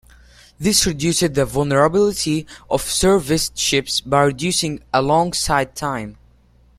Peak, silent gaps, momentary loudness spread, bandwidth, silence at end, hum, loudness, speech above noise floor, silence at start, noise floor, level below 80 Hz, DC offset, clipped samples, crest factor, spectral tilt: -2 dBFS; none; 8 LU; 16 kHz; 0.65 s; none; -18 LUFS; 34 dB; 0.6 s; -52 dBFS; -40 dBFS; under 0.1%; under 0.1%; 18 dB; -3.5 dB/octave